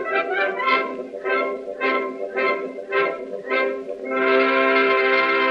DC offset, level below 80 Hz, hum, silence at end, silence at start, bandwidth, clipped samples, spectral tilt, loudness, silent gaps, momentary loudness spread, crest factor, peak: under 0.1%; -72 dBFS; none; 0 s; 0 s; 6.6 kHz; under 0.1%; -4.5 dB/octave; -21 LUFS; none; 10 LU; 16 dB; -6 dBFS